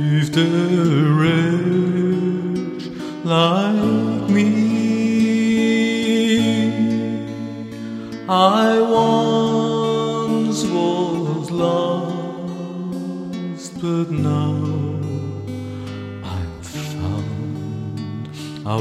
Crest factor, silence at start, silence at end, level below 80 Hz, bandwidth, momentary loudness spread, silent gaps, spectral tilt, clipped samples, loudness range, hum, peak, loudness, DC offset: 18 dB; 0 s; 0 s; -52 dBFS; 13.5 kHz; 13 LU; none; -6.5 dB/octave; under 0.1%; 7 LU; none; -2 dBFS; -19 LUFS; under 0.1%